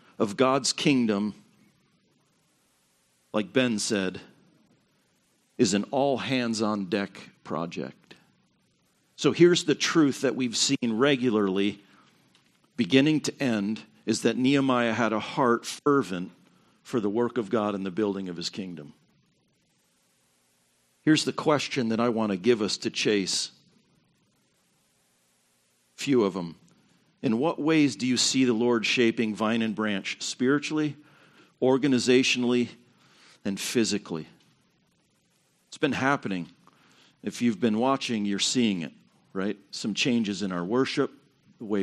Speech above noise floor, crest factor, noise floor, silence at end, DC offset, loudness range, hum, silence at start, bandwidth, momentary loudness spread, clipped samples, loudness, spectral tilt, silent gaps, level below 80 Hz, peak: 43 dB; 22 dB; -69 dBFS; 0 s; under 0.1%; 7 LU; none; 0.2 s; 12.5 kHz; 12 LU; under 0.1%; -26 LUFS; -4 dB/octave; none; -74 dBFS; -4 dBFS